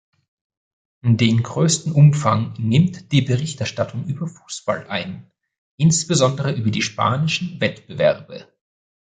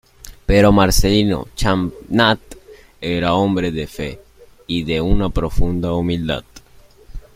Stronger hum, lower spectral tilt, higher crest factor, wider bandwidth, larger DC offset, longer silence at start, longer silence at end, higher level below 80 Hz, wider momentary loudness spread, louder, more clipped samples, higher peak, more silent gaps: neither; about the same, -5.5 dB/octave vs -5.5 dB/octave; about the same, 18 dB vs 18 dB; second, 9.6 kHz vs 16.5 kHz; neither; first, 1.05 s vs 0.25 s; first, 0.7 s vs 0.15 s; second, -54 dBFS vs -26 dBFS; about the same, 13 LU vs 12 LU; about the same, -19 LUFS vs -18 LUFS; neither; about the same, -2 dBFS vs 0 dBFS; first, 5.58-5.78 s vs none